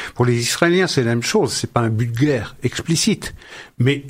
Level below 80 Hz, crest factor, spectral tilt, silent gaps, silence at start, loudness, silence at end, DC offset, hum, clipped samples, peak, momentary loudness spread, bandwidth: -48 dBFS; 18 dB; -5 dB/octave; none; 0 s; -18 LUFS; 0 s; under 0.1%; none; under 0.1%; 0 dBFS; 9 LU; 16 kHz